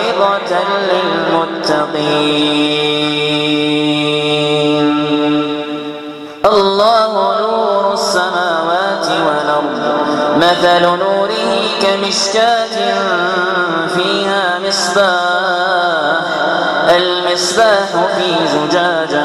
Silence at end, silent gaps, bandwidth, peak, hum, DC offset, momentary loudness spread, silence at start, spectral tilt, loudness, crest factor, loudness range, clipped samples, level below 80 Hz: 0 s; none; 13 kHz; 0 dBFS; none; under 0.1%; 4 LU; 0 s; -3.5 dB/octave; -13 LUFS; 14 dB; 1 LU; under 0.1%; -54 dBFS